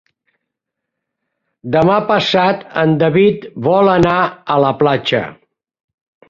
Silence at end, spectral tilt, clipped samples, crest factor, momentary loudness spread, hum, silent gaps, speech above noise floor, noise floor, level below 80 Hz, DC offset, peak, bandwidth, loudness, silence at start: 0.95 s; -7 dB/octave; under 0.1%; 14 dB; 7 LU; none; none; 66 dB; -79 dBFS; -48 dBFS; under 0.1%; -2 dBFS; 7.6 kHz; -14 LUFS; 1.65 s